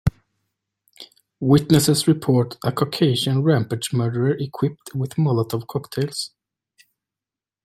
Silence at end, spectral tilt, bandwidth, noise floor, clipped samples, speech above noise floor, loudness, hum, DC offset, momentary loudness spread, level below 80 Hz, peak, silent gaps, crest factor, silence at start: 1.4 s; -6 dB/octave; 16 kHz; -90 dBFS; under 0.1%; 70 dB; -21 LUFS; none; under 0.1%; 11 LU; -46 dBFS; -2 dBFS; none; 20 dB; 0.05 s